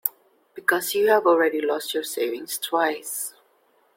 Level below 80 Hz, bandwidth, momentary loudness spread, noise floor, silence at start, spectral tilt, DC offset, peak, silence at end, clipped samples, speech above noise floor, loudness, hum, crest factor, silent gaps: -76 dBFS; 16.5 kHz; 11 LU; -63 dBFS; 0.05 s; -1.5 dB/octave; under 0.1%; -2 dBFS; 0.65 s; under 0.1%; 40 dB; -23 LUFS; none; 22 dB; none